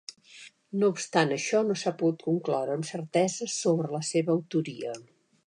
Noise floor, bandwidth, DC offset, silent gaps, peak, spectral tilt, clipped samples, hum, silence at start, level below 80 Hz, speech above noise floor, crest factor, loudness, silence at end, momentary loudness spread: -52 dBFS; 11 kHz; under 0.1%; none; -8 dBFS; -5 dB/octave; under 0.1%; none; 0.1 s; -80 dBFS; 24 dB; 22 dB; -28 LUFS; 0.45 s; 13 LU